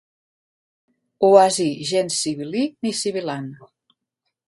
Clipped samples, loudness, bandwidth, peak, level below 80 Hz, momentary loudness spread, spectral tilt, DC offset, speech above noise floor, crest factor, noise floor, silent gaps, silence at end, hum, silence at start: under 0.1%; -20 LUFS; 11.5 kHz; 0 dBFS; -70 dBFS; 14 LU; -4 dB/octave; under 0.1%; 59 dB; 22 dB; -79 dBFS; none; 0.95 s; none; 1.2 s